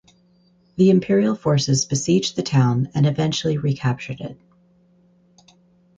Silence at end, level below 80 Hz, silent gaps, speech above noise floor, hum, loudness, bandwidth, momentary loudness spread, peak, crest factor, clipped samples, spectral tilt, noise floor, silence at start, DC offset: 1.65 s; -54 dBFS; none; 39 dB; none; -20 LUFS; 9.2 kHz; 12 LU; -6 dBFS; 16 dB; under 0.1%; -6 dB/octave; -58 dBFS; 0.75 s; under 0.1%